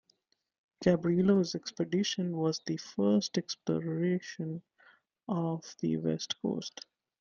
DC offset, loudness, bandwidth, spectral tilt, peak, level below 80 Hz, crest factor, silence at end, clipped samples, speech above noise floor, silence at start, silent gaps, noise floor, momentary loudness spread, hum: under 0.1%; -32 LUFS; 7.4 kHz; -6 dB/octave; -12 dBFS; -70 dBFS; 20 dB; 0.4 s; under 0.1%; 43 dB; 0.8 s; none; -74 dBFS; 12 LU; none